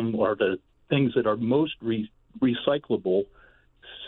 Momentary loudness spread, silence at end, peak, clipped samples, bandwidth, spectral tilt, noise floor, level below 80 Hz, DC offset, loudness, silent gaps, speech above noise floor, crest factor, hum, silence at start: 10 LU; 0 s; -10 dBFS; under 0.1%; 4.2 kHz; -10 dB/octave; -56 dBFS; -60 dBFS; under 0.1%; -26 LUFS; none; 31 dB; 16 dB; none; 0 s